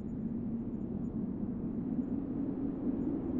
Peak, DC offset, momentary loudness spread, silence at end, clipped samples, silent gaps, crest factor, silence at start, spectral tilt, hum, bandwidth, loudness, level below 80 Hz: -22 dBFS; under 0.1%; 3 LU; 0 s; under 0.1%; none; 14 dB; 0 s; -12 dB/octave; none; 3.1 kHz; -37 LUFS; -52 dBFS